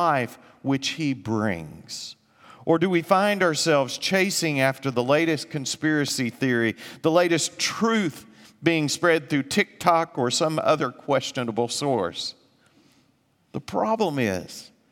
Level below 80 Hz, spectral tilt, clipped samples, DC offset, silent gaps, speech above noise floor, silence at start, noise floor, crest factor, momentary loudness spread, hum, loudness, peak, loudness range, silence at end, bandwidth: -68 dBFS; -4 dB/octave; under 0.1%; under 0.1%; none; 41 dB; 0 s; -65 dBFS; 22 dB; 12 LU; none; -23 LUFS; -4 dBFS; 5 LU; 0.25 s; 17.5 kHz